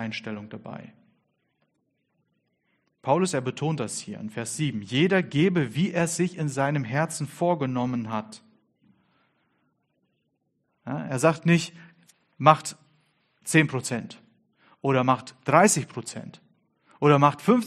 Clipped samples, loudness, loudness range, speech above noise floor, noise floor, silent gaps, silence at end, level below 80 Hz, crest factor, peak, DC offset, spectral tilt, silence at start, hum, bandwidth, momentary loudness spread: under 0.1%; -24 LUFS; 8 LU; 50 dB; -74 dBFS; none; 0 s; -68 dBFS; 24 dB; -2 dBFS; under 0.1%; -5 dB/octave; 0 s; none; 13 kHz; 17 LU